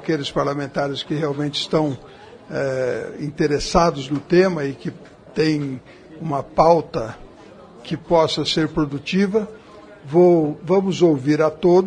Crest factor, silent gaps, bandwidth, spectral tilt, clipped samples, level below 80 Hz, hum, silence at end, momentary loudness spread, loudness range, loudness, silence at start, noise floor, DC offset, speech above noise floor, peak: 18 dB; none; 10 kHz; -6 dB/octave; under 0.1%; -44 dBFS; none; 0 s; 15 LU; 4 LU; -20 LUFS; 0 s; -43 dBFS; under 0.1%; 24 dB; 0 dBFS